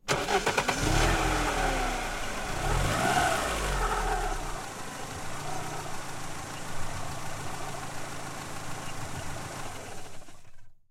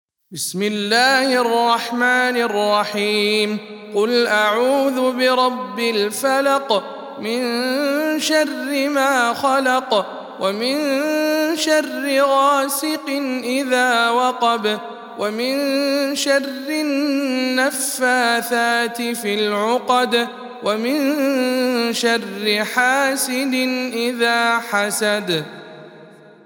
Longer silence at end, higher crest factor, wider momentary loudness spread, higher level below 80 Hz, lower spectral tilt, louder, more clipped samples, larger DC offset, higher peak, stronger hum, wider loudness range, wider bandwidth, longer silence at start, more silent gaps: second, 0.1 s vs 0.35 s; about the same, 20 dB vs 16 dB; first, 12 LU vs 7 LU; first, -38 dBFS vs -78 dBFS; about the same, -3.5 dB/octave vs -2.5 dB/octave; second, -31 LUFS vs -18 LUFS; neither; neither; second, -10 dBFS vs -2 dBFS; neither; first, 10 LU vs 2 LU; about the same, 16.5 kHz vs 18 kHz; second, 0.05 s vs 0.3 s; neither